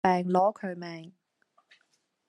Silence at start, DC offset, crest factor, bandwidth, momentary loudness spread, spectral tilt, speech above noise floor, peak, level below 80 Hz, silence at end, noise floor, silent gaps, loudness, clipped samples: 0.05 s; under 0.1%; 22 dB; 10 kHz; 17 LU; -7.5 dB/octave; 46 dB; -8 dBFS; -70 dBFS; 1.2 s; -73 dBFS; none; -28 LUFS; under 0.1%